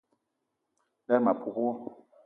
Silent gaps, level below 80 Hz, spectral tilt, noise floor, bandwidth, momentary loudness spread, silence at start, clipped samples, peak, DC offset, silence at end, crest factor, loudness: none; -80 dBFS; -9.5 dB/octave; -82 dBFS; 3.9 kHz; 15 LU; 1.1 s; under 0.1%; -10 dBFS; under 0.1%; 0.35 s; 22 dB; -29 LUFS